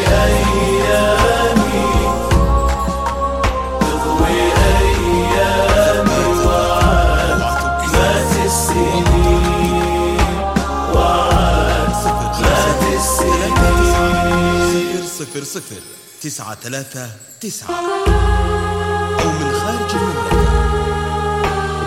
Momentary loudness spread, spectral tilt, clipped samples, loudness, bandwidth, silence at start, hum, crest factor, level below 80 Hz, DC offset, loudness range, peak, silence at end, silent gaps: 11 LU; -5 dB/octave; under 0.1%; -15 LUFS; 16 kHz; 0 s; none; 14 dB; -20 dBFS; under 0.1%; 6 LU; 0 dBFS; 0 s; none